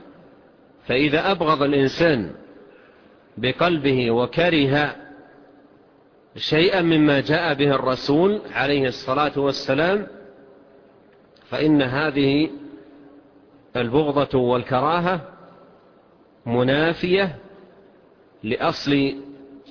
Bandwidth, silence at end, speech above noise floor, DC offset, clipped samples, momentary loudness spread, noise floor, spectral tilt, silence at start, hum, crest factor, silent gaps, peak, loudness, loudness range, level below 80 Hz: 5.4 kHz; 0.1 s; 34 dB; under 0.1%; under 0.1%; 11 LU; -54 dBFS; -7 dB/octave; 0.85 s; none; 16 dB; none; -6 dBFS; -20 LUFS; 4 LU; -52 dBFS